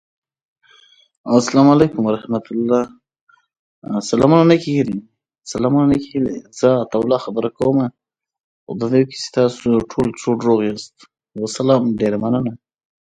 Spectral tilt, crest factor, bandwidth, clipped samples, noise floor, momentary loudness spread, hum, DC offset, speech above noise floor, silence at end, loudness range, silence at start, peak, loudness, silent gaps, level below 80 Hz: -6.5 dB/octave; 18 dB; 9.4 kHz; under 0.1%; -51 dBFS; 14 LU; none; under 0.1%; 35 dB; 0.6 s; 3 LU; 1.25 s; 0 dBFS; -17 LUFS; 3.21-3.27 s, 3.59-3.82 s, 8.40-8.67 s; -50 dBFS